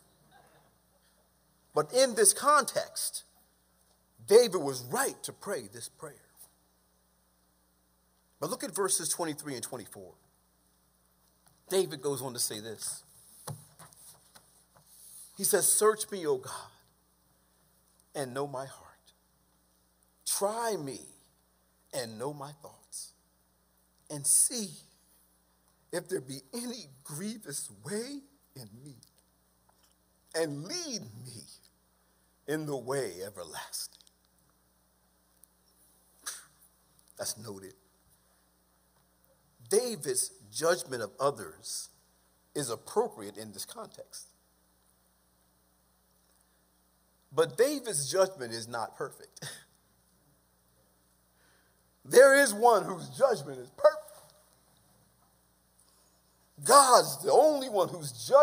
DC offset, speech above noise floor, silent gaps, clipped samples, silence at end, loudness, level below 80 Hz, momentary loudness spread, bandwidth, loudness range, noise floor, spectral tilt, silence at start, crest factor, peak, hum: under 0.1%; 40 dB; none; under 0.1%; 0 s; -29 LUFS; -76 dBFS; 23 LU; 16 kHz; 18 LU; -70 dBFS; -2.5 dB/octave; 1.75 s; 28 dB; -6 dBFS; none